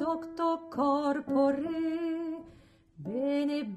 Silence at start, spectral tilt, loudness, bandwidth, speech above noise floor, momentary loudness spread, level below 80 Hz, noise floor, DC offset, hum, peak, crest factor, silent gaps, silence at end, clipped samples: 0 s; -7 dB/octave; -31 LUFS; 9 kHz; 28 dB; 10 LU; -66 dBFS; -58 dBFS; under 0.1%; none; -16 dBFS; 16 dB; none; 0 s; under 0.1%